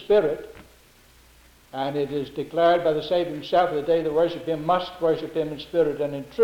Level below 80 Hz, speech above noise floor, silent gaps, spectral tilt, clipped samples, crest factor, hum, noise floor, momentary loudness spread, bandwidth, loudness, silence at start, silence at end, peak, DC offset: -56 dBFS; 31 dB; none; -6.5 dB/octave; under 0.1%; 16 dB; none; -54 dBFS; 9 LU; 17.5 kHz; -24 LUFS; 0 s; 0 s; -8 dBFS; under 0.1%